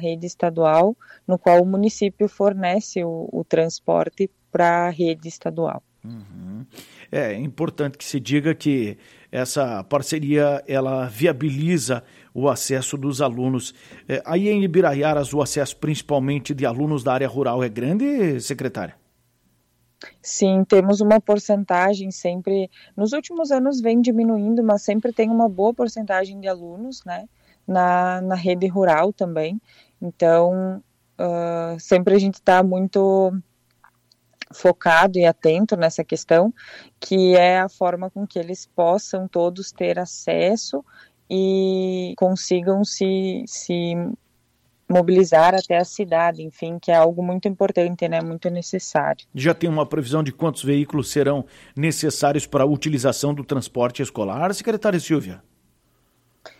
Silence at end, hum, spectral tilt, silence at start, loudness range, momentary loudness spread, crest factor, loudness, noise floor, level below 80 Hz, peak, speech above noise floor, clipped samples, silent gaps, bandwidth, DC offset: 0.1 s; none; -5.5 dB/octave; 0 s; 5 LU; 12 LU; 16 dB; -20 LUFS; -64 dBFS; -60 dBFS; -4 dBFS; 44 dB; under 0.1%; none; 15.5 kHz; under 0.1%